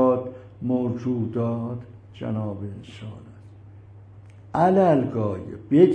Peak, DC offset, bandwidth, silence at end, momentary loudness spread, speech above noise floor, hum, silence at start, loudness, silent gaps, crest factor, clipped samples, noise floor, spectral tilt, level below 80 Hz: -2 dBFS; under 0.1%; 8.8 kHz; 0 s; 20 LU; 23 dB; none; 0 s; -24 LUFS; none; 20 dB; under 0.1%; -45 dBFS; -9.5 dB/octave; -58 dBFS